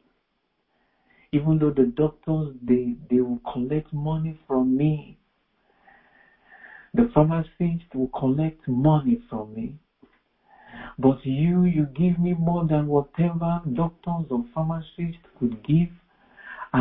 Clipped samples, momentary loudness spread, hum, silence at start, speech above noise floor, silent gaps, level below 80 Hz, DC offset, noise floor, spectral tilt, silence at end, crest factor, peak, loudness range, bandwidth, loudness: under 0.1%; 10 LU; none; 1.35 s; 51 dB; none; -50 dBFS; under 0.1%; -74 dBFS; -13 dB/octave; 0 s; 20 dB; -4 dBFS; 4 LU; 3.9 kHz; -24 LUFS